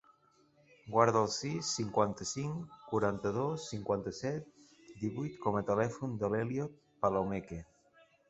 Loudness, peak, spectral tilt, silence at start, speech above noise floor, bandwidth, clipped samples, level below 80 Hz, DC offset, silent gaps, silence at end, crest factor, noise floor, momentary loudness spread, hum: -35 LUFS; -10 dBFS; -5 dB/octave; 0.85 s; 34 dB; 8.2 kHz; under 0.1%; -64 dBFS; under 0.1%; none; 0.65 s; 24 dB; -68 dBFS; 10 LU; none